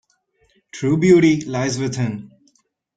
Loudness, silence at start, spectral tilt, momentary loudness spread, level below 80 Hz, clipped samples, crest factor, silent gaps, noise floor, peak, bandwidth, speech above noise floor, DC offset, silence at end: -18 LUFS; 0.75 s; -6 dB/octave; 15 LU; -54 dBFS; under 0.1%; 18 dB; none; -63 dBFS; -2 dBFS; 9.2 kHz; 46 dB; under 0.1%; 0.7 s